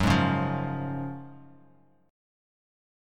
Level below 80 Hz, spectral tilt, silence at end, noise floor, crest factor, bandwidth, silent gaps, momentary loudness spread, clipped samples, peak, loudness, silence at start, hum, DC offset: -48 dBFS; -6.5 dB/octave; 1.65 s; -60 dBFS; 20 dB; 14.5 kHz; none; 19 LU; under 0.1%; -10 dBFS; -29 LUFS; 0 s; none; under 0.1%